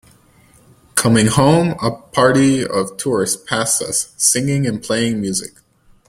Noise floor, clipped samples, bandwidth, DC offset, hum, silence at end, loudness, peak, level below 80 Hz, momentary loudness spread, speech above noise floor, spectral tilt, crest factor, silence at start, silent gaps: -50 dBFS; under 0.1%; 16.5 kHz; under 0.1%; none; 0.6 s; -16 LUFS; 0 dBFS; -48 dBFS; 8 LU; 34 dB; -4 dB/octave; 18 dB; 0.95 s; none